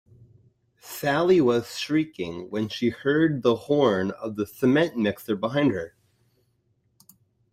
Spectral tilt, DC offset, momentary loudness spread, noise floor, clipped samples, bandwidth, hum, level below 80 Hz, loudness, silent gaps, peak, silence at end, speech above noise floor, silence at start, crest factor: -6 dB/octave; under 0.1%; 11 LU; -69 dBFS; under 0.1%; 16 kHz; none; -62 dBFS; -24 LUFS; none; -8 dBFS; 1.65 s; 46 dB; 0.85 s; 16 dB